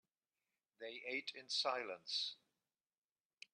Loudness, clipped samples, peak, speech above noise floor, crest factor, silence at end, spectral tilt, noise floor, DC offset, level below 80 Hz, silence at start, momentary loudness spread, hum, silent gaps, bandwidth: -42 LUFS; under 0.1%; -26 dBFS; over 46 dB; 22 dB; 1.2 s; -0.5 dB/octave; under -90 dBFS; under 0.1%; under -90 dBFS; 0.8 s; 16 LU; none; none; 10.5 kHz